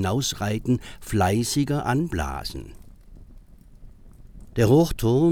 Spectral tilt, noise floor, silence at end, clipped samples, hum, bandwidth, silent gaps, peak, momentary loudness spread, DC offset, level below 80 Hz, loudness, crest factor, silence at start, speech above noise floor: -6 dB/octave; -47 dBFS; 0 s; under 0.1%; none; 18.5 kHz; none; -6 dBFS; 14 LU; under 0.1%; -40 dBFS; -23 LUFS; 18 dB; 0 s; 25 dB